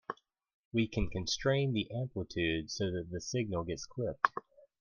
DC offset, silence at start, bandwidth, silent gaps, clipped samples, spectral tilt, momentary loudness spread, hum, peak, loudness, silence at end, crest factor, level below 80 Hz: under 0.1%; 0.1 s; 10 kHz; 0.54-0.71 s; under 0.1%; -5 dB/octave; 8 LU; none; -8 dBFS; -35 LUFS; 0.4 s; 28 dB; -50 dBFS